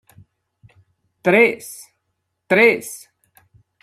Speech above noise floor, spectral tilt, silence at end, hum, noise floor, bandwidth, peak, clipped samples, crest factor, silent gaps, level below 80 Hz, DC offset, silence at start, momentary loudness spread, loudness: 58 dB; -4.5 dB/octave; 0.85 s; none; -74 dBFS; 14.5 kHz; -2 dBFS; under 0.1%; 20 dB; none; -66 dBFS; under 0.1%; 1.25 s; 22 LU; -16 LUFS